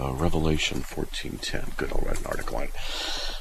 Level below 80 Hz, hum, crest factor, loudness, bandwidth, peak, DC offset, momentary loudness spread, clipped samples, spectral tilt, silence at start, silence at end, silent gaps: -30 dBFS; none; 18 dB; -30 LUFS; 14.5 kHz; -10 dBFS; under 0.1%; 8 LU; under 0.1%; -4.5 dB/octave; 0 s; 0 s; none